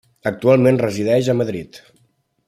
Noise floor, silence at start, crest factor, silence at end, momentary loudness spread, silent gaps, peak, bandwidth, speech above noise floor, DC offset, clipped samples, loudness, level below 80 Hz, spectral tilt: -62 dBFS; 0.25 s; 16 dB; 0.7 s; 11 LU; none; -2 dBFS; 14.5 kHz; 46 dB; under 0.1%; under 0.1%; -17 LUFS; -58 dBFS; -7 dB/octave